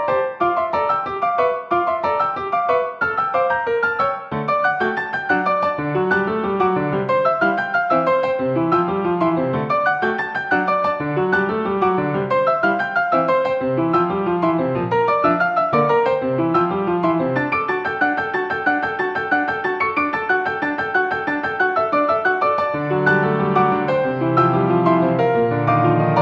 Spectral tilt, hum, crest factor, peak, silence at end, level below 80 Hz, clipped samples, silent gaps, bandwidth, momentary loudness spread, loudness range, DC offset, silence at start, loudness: -8.5 dB/octave; none; 16 dB; -2 dBFS; 0 s; -54 dBFS; under 0.1%; none; 7 kHz; 4 LU; 2 LU; under 0.1%; 0 s; -19 LUFS